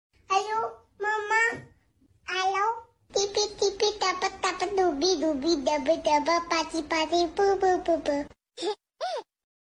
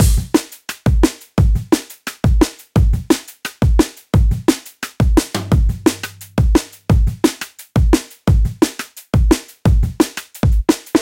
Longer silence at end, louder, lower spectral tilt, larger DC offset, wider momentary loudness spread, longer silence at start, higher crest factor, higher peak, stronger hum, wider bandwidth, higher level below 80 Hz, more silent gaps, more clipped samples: first, 0.55 s vs 0 s; second, -27 LUFS vs -17 LUFS; second, -2 dB/octave vs -6 dB/octave; neither; first, 10 LU vs 5 LU; first, 0.3 s vs 0 s; about the same, 16 dB vs 16 dB; second, -12 dBFS vs 0 dBFS; neither; second, 11 kHz vs 17 kHz; second, -58 dBFS vs -20 dBFS; neither; neither